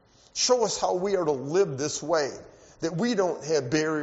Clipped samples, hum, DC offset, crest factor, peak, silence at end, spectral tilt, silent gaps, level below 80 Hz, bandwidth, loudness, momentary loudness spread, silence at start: under 0.1%; none; under 0.1%; 18 dB; -8 dBFS; 0 s; -4 dB/octave; none; -62 dBFS; 8 kHz; -26 LUFS; 9 LU; 0.35 s